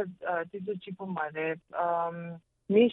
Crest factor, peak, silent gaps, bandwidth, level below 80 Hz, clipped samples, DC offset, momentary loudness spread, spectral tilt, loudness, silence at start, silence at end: 20 dB; -12 dBFS; none; 4.1 kHz; -78 dBFS; under 0.1%; under 0.1%; 12 LU; -9.5 dB/octave; -32 LUFS; 0 s; 0 s